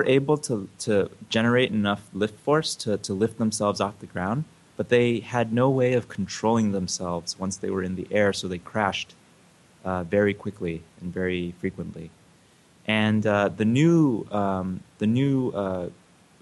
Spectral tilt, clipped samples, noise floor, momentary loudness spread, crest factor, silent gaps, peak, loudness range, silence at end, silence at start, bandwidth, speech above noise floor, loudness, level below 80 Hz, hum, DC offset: -5.5 dB/octave; under 0.1%; -57 dBFS; 11 LU; 18 dB; none; -6 dBFS; 5 LU; 0.5 s; 0 s; 12 kHz; 33 dB; -25 LUFS; -60 dBFS; none; under 0.1%